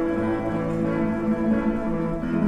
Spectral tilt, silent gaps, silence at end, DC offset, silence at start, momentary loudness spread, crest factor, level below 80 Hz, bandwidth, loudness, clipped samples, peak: -9 dB/octave; none; 0 s; under 0.1%; 0 s; 3 LU; 12 dB; -40 dBFS; 9 kHz; -24 LUFS; under 0.1%; -12 dBFS